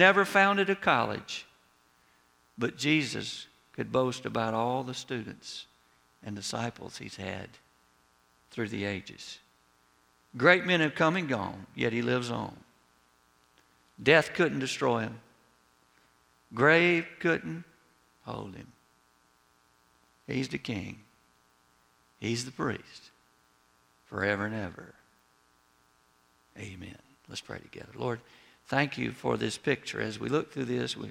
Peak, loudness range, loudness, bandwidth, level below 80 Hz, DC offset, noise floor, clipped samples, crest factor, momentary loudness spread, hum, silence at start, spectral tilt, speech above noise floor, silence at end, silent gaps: -6 dBFS; 12 LU; -29 LUFS; 16.5 kHz; -68 dBFS; under 0.1%; -67 dBFS; under 0.1%; 26 dB; 21 LU; none; 0 s; -5 dB/octave; 37 dB; 0 s; none